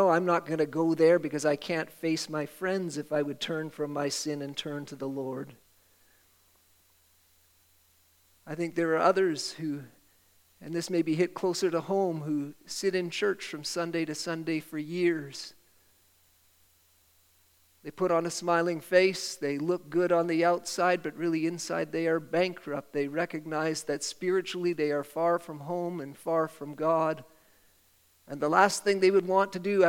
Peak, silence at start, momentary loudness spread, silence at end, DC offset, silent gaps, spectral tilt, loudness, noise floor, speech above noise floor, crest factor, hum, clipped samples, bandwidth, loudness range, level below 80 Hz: -8 dBFS; 0 s; 12 LU; 0 s; under 0.1%; none; -4.5 dB/octave; -29 LUFS; -65 dBFS; 36 dB; 22 dB; none; under 0.1%; 17 kHz; 9 LU; -74 dBFS